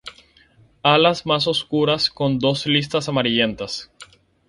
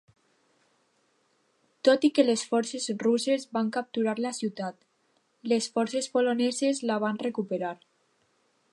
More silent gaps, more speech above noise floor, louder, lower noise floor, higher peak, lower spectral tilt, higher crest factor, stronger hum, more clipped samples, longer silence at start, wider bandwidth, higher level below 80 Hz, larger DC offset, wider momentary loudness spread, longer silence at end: neither; second, 34 dB vs 44 dB; first, -19 LUFS vs -27 LUFS; second, -54 dBFS vs -71 dBFS; first, -2 dBFS vs -8 dBFS; about the same, -5 dB/octave vs -4 dB/octave; about the same, 18 dB vs 20 dB; neither; neither; second, 0.05 s vs 1.85 s; about the same, 11.5 kHz vs 11.5 kHz; first, -54 dBFS vs -84 dBFS; neither; about the same, 11 LU vs 10 LU; second, 0.45 s vs 1 s